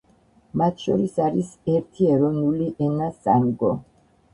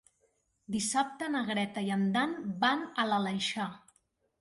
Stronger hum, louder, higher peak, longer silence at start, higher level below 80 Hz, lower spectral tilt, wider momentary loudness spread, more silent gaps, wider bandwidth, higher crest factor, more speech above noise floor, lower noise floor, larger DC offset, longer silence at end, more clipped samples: neither; first, -22 LUFS vs -32 LUFS; first, -4 dBFS vs -14 dBFS; second, 0.55 s vs 0.7 s; first, -56 dBFS vs -72 dBFS; first, -9 dB/octave vs -4 dB/octave; about the same, 6 LU vs 5 LU; neither; about the same, 10.5 kHz vs 11.5 kHz; about the same, 18 dB vs 20 dB; second, 36 dB vs 43 dB; second, -58 dBFS vs -74 dBFS; neither; about the same, 0.5 s vs 0.6 s; neither